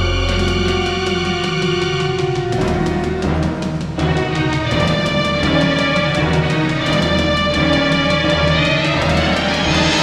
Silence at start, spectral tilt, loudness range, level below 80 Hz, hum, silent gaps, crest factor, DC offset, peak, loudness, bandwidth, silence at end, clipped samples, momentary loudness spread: 0 s; -5.5 dB/octave; 3 LU; -28 dBFS; none; none; 14 dB; under 0.1%; -2 dBFS; -16 LUFS; 11.5 kHz; 0 s; under 0.1%; 4 LU